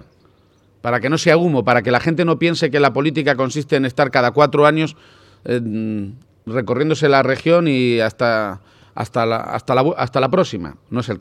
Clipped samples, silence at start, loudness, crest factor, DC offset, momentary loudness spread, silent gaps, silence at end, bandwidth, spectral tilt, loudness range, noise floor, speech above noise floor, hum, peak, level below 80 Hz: under 0.1%; 0.85 s; -17 LUFS; 18 dB; under 0.1%; 12 LU; none; 0 s; 13 kHz; -6 dB/octave; 2 LU; -54 dBFS; 38 dB; none; 0 dBFS; -56 dBFS